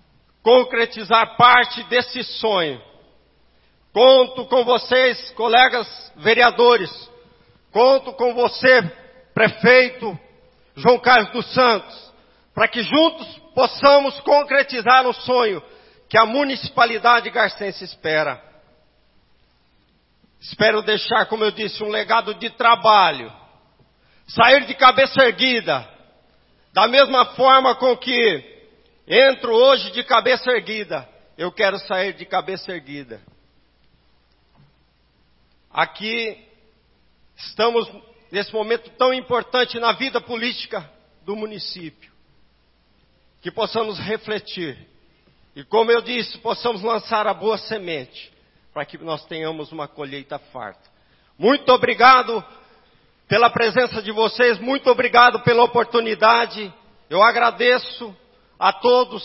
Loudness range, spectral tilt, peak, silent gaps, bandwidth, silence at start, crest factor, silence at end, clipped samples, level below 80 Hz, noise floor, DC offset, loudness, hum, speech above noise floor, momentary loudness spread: 13 LU; -7 dB/octave; 0 dBFS; none; 5.8 kHz; 0.45 s; 18 dB; 0 s; under 0.1%; -60 dBFS; -60 dBFS; under 0.1%; -17 LUFS; none; 42 dB; 18 LU